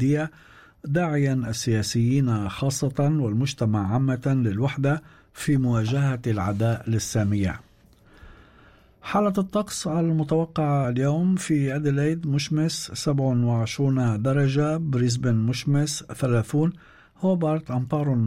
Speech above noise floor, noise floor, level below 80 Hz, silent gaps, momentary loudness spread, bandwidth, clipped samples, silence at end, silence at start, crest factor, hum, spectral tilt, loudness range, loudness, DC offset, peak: 32 dB; -55 dBFS; -52 dBFS; none; 4 LU; 15 kHz; under 0.1%; 0 s; 0 s; 12 dB; none; -6.5 dB/octave; 4 LU; -24 LUFS; under 0.1%; -12 dBFS